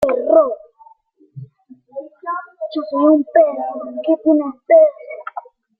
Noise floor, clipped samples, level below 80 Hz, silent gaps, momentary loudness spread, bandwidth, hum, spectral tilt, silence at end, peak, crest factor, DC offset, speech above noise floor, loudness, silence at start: -50 dBFS; under 0.1%; -62 dBFS; none; 20 LU; 5 kHz; none; -8 dB/octave; 0.4 s; -2 dBFS; 16 dB; under 0.1%; 36 dB; -16 LUFS; 0 s